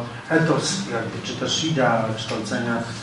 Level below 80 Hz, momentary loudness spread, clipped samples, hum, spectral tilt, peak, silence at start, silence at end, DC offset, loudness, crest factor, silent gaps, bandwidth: -56 dBFS; 7 LU; under 0.1%; none; -4.5 dB/octave; -6 dBFS; 0 s; 0 s; under 0.1%; -23 LUFS; 18 dB; none; 11.5 kHz